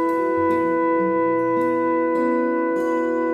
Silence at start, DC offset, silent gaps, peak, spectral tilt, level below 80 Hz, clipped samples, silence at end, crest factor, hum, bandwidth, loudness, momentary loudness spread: 0 s; under 0.1%; none; -10 dBFS; -8 dB/octave; -64 dBFS; under 0.1%; 0 s; 10 dB; none; 7.4 kHz; -20 LUFS; 2 LU